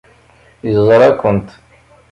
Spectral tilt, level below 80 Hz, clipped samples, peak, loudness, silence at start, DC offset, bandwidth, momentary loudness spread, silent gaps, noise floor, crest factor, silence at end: -8 dB/octave; -42 dBFS; under 0.1%; 0 dBFS; -12 LUFS; 0.65 s; under 0.1%; 9.8 kHz; 11 LU; none; -47 dBFS; 14 dB; 0.65 s